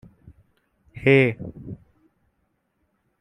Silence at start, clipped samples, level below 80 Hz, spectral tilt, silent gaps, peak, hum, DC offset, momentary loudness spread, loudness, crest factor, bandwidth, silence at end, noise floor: 0.95 s; under 0.1%; -56 dBFS; -8 dB/octave; none; -4 dBFS; none; under 0.1%; 23 LU; -19 LUFS; 22 dB; 9.6 kHz; 1.45 s; -72 dBFS